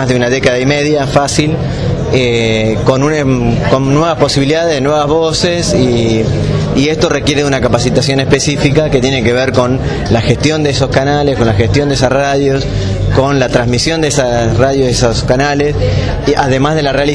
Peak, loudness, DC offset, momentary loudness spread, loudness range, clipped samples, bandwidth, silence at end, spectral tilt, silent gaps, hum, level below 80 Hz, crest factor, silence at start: 0 dBFS; -11 LUFS; under 0.1%; 3 LU; 1 LU; 0.6%; 11 kHz; 0 s; -5.5 dB/octave; none; none; -26 dBFS; 10 dB; 0 s